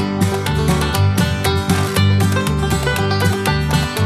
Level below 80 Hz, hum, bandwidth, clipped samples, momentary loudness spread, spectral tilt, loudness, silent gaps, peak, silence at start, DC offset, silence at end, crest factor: -28 dBFS; none; 14 kHz; under 0.1%; 3 LU; -5.5 dB/octave; -16 LUFS; none; -2 dBFS; 0 s; under 0.1%; 0 s; 14 dB